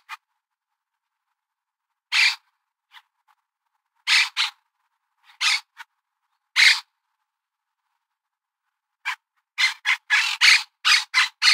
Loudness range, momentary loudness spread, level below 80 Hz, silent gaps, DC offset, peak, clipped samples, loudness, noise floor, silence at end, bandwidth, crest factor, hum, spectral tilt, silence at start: 7 LU; 16 LU; under -90 dBFS; none; under 0.1%; -2 dBFS; under 0.1%; -18 LUFS; -85 dBFS; 0 s; 16 kHz; 24 dB; none; 12.5 dB/octave; 0.1 s